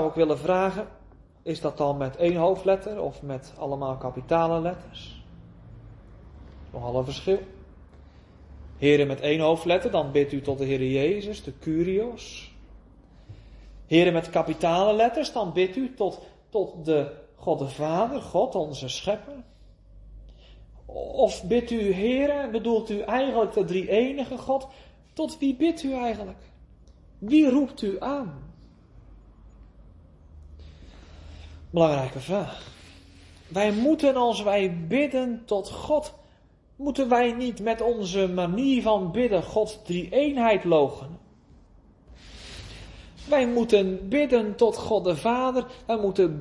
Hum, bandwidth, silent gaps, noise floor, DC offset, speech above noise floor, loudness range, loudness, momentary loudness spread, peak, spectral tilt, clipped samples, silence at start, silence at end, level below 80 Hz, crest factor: none; 11.5 kHz; none; -57 dBFS; under 0.1%; 33 dB; 6 LU; -25 LUFS; 17 LU; -6 dBFS; -6 dB/octave; under 0.1%; 0 s; 0 s; -50 dBFS; 20 dB